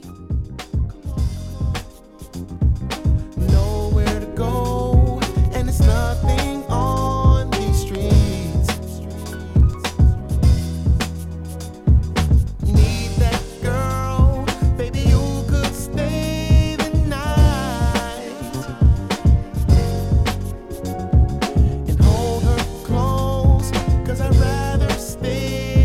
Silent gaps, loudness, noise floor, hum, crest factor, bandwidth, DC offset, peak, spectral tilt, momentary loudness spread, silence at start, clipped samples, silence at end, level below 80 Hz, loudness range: none; -19 LUFS; -39 dBFS; none; 16 dB; 15 kHz; under 0.1%; -2 dBFS; -6.5 dB/octave; 10 LU; 0 s; under 0.1%; 0 s; -20 dBFS; 2 LU